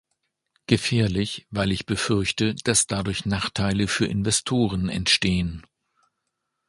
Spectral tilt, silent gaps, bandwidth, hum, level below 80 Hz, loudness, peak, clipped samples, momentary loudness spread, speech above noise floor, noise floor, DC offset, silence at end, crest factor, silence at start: -4 dB/octave; none; 11.5 kHz; none; -44 dBFS; -23 LUFS; -4 dBFS; under 0.1%; 6 LU; 56 dB; -79 dBFS; under 0.1%; 1.05 s; 20 dB; 0.7 s